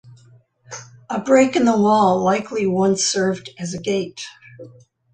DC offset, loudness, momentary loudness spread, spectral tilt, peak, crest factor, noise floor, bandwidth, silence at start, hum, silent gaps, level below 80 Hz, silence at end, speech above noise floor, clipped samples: under 0.1%; -18 LUFS; 20 LU; -4.5 dB/octave; -2 dBFS; 16 dB; -51 dBFS; 9.6 kHz; 0.05 s; none; none; -60 dBFS; 0.45 s; 34 dB; under 0.1%